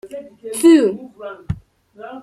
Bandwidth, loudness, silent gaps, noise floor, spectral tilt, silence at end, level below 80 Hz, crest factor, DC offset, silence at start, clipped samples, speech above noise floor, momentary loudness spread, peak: 14.5 kHz; -13 LUFS; none; -42 dBFS; -5.5 dB/octave; 0 s; -46 dBFS; 16 dB; under 0.1%; 0.05 s; under 0.1%; 27 dB; 23 LU; -2 dBFS